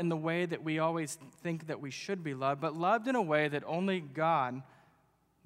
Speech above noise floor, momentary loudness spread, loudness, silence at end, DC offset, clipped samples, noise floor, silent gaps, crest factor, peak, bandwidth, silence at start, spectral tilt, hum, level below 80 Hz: 38 dB; 9 LU; -33 LUFS; 0.8 s; under 0.1%; under 0.1%; -71 dBFS; none; 20 dB; -14 dBFS; 15.5 kHz; 0 s; -6 dB/octave; none; -80 dBFS